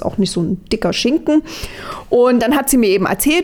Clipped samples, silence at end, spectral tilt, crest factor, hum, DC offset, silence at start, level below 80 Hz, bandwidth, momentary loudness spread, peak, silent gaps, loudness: under 0.1%; 0 s; -4.5 dB/octave; 10 dB; none; under 0.1%; 0 s; -38 dBFS; over 20 kHz; 15 LU; -4 dBFS; none; -15 LUFS